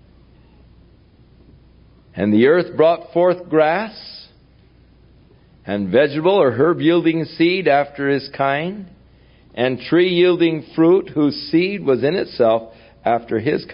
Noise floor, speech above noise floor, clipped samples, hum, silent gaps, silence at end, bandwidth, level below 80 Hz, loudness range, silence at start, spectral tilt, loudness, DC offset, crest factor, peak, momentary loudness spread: -50 dBFS; 34 dB; under 0.1%; none; none; 0 s; 5.4 kHz; -54 dBFS; 3 LU; 2.15 s; -11.5 dB/octave; -17 LUFS; under 0.1%; 16 dB; -2 dBFS; 11 LU